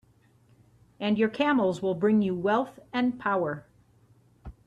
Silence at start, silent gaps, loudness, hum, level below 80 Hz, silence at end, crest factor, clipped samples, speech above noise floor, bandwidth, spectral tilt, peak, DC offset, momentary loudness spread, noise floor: 1 s; none; -27 LUFS; none; -58 dBFS; 0.15 s; 16 dB; under 0.1%; 36 dB; 10 kHz; -7 dB/octave; -12 dBFS; under 0.1%; 9 LU; -62 dBFS